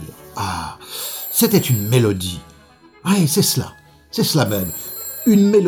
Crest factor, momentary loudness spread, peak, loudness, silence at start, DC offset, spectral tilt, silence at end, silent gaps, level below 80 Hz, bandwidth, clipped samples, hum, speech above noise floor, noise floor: 18 dB; 13 LU; 0 dBFS; -18 LUFS; 0 s; under 0.1%; -5 dB/octave; 0 s; none; -50 dBFS; over 20 kHz; under 0.1%; none; 32 dB; -48 dBFS